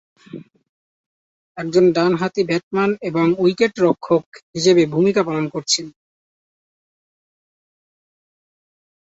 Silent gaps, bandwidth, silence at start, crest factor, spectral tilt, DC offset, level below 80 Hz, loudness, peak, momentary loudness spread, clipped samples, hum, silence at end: 0.69-1.55 s, 2.63-2.71 s, 4.26-4.32 s, 4.42-4.53 s; 8 kHz; 0.35 s; 18 dB; -5 dB/octave; under 0.1%; -62 dBFS; -18 LUFS; -2 dBFS; 23 LU; under 0.1%; none; 3.25 s